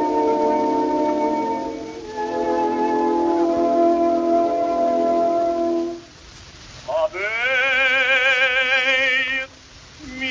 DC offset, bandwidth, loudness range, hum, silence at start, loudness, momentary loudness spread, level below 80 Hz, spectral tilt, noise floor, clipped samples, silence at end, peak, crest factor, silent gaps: under 0.1%; 7.6 kHz; 4 LU; none; 0 s; -19 LUFS; 13 LU; -52 dBFS; -3.5 dB/octave; -44 dBFS; under 0.1%; 0 s; -6 dBFS; 14 dB; none